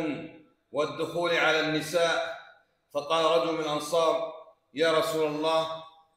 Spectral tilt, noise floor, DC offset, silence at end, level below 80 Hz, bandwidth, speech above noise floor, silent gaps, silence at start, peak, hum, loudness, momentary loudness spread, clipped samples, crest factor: -3.5 dB/octave; -58 dBFS; under 0.1%; 0.3 s; -72 dBFS; 16 kHz; 31 dB; none; 0 s; -10 dBFS; none; -27 LUFS; 14 LU; under 0.1%; 18 dB